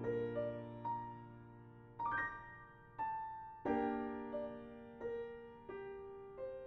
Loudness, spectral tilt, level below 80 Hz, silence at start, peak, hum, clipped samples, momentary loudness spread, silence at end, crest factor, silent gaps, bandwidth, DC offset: -44 LUFS; -6 dB/octave; -68 dBFS; 0 s; -26 dBFS; none; under 0.1%; 16 LU; 0 s; 18 dB; none; 6.2 kHz; under 0.1%